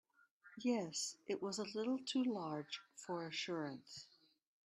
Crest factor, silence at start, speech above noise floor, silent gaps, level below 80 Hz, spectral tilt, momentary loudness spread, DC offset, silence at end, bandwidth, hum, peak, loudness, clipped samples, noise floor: 16 dB; 0.45 s; 25 dB; none; -88 dBFS; -3.5 dB/octave; 14 LU; under 0.1%; 0.6 s; 12.5 kHz; none; -28 dBFS; -43 LUFS; under 0.1%; -68 dBFS